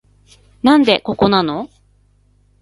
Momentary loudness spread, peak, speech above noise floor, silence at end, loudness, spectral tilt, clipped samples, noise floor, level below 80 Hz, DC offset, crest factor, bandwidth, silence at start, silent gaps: 13 LU; 0 dBFS; 41 dB; 0.95 s; -15 LUFS; -6.5 dB/octave; under 0.1%; -55 dBFS; -48 dBFS; under 0.1%; 18 dB; 11.5 kHz; 0.65 s; none